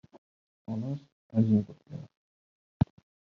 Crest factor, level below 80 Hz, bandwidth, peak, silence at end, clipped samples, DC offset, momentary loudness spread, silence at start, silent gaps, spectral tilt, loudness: 22 dB; -56 dBFS; 6 kHz; -10 dBFS; 0.4 s; under 0.1%; under 0.1%; 20 LU; 0.7 s; 1.12-1.30 s, 2.17-2.80 s; -10.5 dB/octave; -31 LUFS